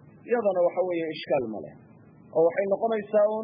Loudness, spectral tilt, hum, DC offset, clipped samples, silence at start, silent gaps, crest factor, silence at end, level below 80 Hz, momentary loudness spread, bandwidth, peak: -26 LUFS; -10 dB/octave; none; under 0.1%; under 0.1%; 0.25 s; none; 14 dB; 0 s; -72 dBFS; 9 LU; 5.2 kHz; -12 dBFS